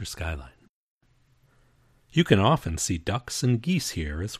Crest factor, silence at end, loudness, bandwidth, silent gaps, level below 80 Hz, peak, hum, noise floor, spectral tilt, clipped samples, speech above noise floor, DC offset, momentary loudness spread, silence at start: 22 dB; 0 s; -25 LUFS; 15 kHz; 0.69-0.99 s; -42 dBFS; -6 dBFS; none; -64 dBFS; -5 dB/octave; under 0.1%; 38 dB; under 0.1%; 13 LU; 0 s